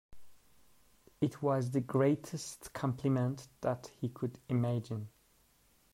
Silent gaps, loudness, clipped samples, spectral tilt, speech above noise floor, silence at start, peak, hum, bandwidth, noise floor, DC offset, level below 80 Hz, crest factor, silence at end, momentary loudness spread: none; -35 LUFS; under 0.1%; -7 dB/octave; 35 dB; 0.1 s; -18 dBFS; none; 15.5 kHz; -69 dBFS; under 0.1%; -68 dBFS; 18 dB; 0.85 s; 12 LU